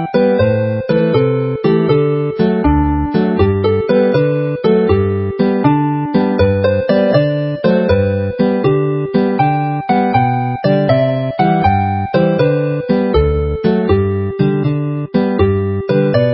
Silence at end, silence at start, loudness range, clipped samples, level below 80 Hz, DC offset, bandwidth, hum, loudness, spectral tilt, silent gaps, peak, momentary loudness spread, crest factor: 0 s; 0 s; 1 LU; under 0.1%; -28 dBFS; under 0.1%; 5.8 kHz; none; -14 LUFS; -13 dB/octave; none; 0 dBFS; 3 LU; 14 dB